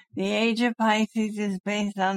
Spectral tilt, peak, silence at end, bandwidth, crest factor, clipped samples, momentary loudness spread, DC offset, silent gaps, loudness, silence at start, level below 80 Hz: -5 dB/octave; -10 dBFS; 0 s; 12.5 kHz; 16 dB; under 0.1%; 5 LU; under 0.1%; 1.60-1.64 s; -25 LUFS; 0.15 s; -68 dBFS